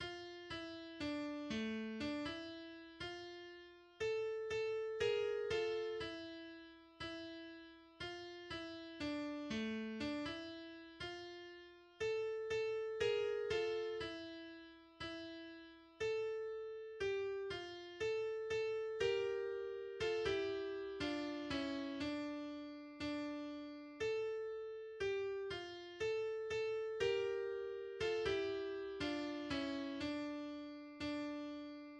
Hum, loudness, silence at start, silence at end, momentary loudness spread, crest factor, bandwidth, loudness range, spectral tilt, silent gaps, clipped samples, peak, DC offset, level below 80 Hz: none; -43 LUFS; 0 s; 0 s; 13 LU; 18 dB; 9.8 kHz; 5 LU; -4.5 dB/octave; none; under 0.1%; -26 dBFS; under 0.1%; -70 dBFS